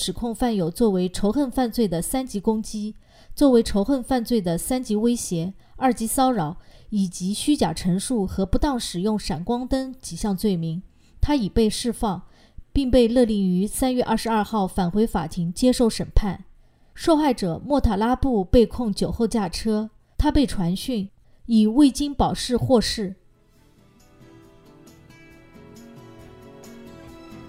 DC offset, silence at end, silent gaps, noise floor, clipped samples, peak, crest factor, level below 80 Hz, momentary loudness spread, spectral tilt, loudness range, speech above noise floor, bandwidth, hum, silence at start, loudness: under 0.1%; 0 s; none; -56 dBFS; under 0.1%; -4 dBFS; 20 dB; -34 dBFS; 11 LU; -5.5 dB/octave; 3 LU; 34 dB; 16 kHz; none; 0 s; -23 LUFS